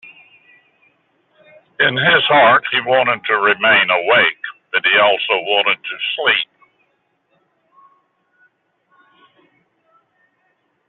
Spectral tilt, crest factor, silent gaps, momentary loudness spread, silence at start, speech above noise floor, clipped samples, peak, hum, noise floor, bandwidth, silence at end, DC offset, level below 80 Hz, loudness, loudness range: 0.5 dB/octave; 16 dB; none; 7 LU; 0.05 s; 50 dB; under 0.1%; -2 dBFS; none; -65 dBFS; 4.3 kHz; 4.45 s; under 0.1%; -68 dBFS; -14 LUFS; 9 LU